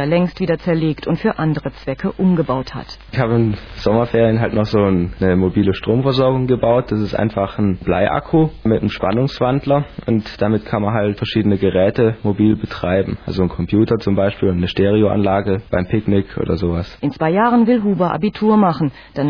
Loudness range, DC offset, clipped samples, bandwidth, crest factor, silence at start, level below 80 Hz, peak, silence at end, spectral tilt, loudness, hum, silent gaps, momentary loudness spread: 2 LU; under 0.1%; under 0.1%; 5.4 kHz; 14 dB; 0 s; -38 dBFS; -2 dBFS; 0 s; -9 dB/octave; -17 LUFS; none; none; 6 LU